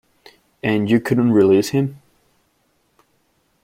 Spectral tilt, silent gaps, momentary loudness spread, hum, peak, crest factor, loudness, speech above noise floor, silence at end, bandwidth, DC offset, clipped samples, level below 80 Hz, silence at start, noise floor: -7 dB/octave; none; 10 LU; none; -2 dBFS; 18 dB; -17 LUFS; 48 dB; 1.7 s; 16 kHz; under 0.1%; under 0.1%; -58 dBFS; 0.65 s; -64 dBFS